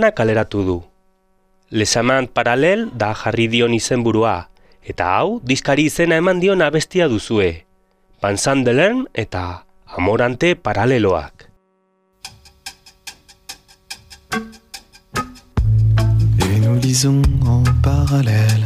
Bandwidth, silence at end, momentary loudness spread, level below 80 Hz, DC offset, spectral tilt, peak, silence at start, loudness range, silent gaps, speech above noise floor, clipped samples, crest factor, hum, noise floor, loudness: 15 kHz; 0 s; 21 LU; -30 dBFS; under 0.1%; -5.5 dB/octave; 0 dBFS; 0 s; 12 LU; none; 46 dB; under 0.1%; 16 dB; none; -62 dBFS; -17 LUFS